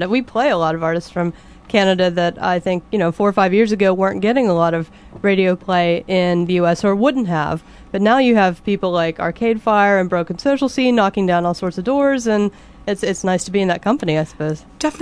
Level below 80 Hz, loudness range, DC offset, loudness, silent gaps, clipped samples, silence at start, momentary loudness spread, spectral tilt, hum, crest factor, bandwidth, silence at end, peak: -48 dBFS; 2 LU; under 0.1%; -17 LUFS; none; under 0.1%; 0 s; 8 LU; -6 dB/octave; none; 16 dB; 11 kHz; 0 s; -2 dBFS